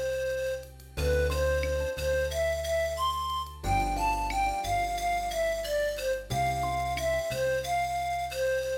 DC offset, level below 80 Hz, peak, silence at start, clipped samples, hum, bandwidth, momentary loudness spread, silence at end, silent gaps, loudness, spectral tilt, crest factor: under 0.1%; -38 dBFS; -16 dBFS; 0 s; under 0.1%; none; 17 kHz; 4 LU; 0 s; none; -30 LUFS; -4 dB/octave; 14 dB